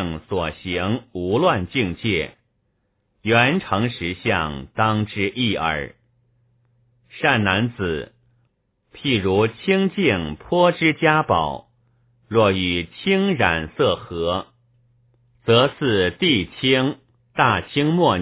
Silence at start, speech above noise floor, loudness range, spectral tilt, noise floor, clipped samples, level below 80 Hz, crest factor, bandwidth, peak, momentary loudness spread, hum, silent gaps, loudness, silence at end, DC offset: 0 s; 49 dB; 4 LU; -9.5 dB/octave; -69 dBFS; under 0.1%; -44 dBFS; 20 dB; 4 kHz; 0 dBFS; 9 LU; none; none; -20 LUFS; 0 s; under 0.1%